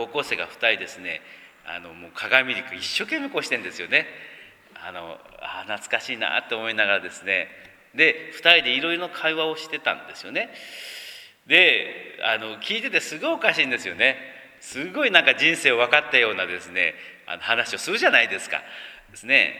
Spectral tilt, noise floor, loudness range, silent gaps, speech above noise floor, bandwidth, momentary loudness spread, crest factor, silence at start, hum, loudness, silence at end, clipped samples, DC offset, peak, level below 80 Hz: -2 dB/octave; -46 dBFS; 7 LU; none; 23 dB; 19.5 kHz; 20 LU; 24 dB; 0 s; none; -21 LUFS; 0 s; under 0.1%; under 0.1%; 0 dBFS; -68 dBFS